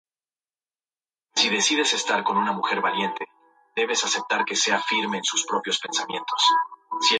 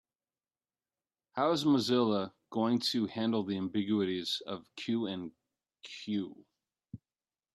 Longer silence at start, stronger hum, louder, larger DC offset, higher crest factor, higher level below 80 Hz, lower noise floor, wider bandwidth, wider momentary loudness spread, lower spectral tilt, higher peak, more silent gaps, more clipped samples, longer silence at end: about the same, 1.35 s vs 1.35 s; neither; first, -23 LUFS vs -33 LUFS; neither; about the same, 18 dB vs 18 dB; about the same, -78 dBFS vs -78 dBFS; about the same, under -90 dBFS vs under -90 dBFS; second, 10 kHz vs 13 kHz; second, 8 LU vs 19 LU; second, -1 dB/octave vs -5.5 dB/octave; first, -8 dBFS vs -16 dBFS; neither; neither; second, 0 s vs 0.55 s